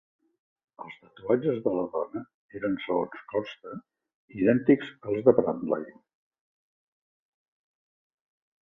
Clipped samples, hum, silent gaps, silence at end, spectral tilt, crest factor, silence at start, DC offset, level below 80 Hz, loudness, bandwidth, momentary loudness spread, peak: under 0.1%; none; 2.34-2.49 s, 4.14-4.28 s; 2.75 s; -9 dB/octave; 26 dB; 0.8 s; under 0.1%; -68 dBFS; -27 LUFS; 5.8 kHz; 22 LU; -4 dBFS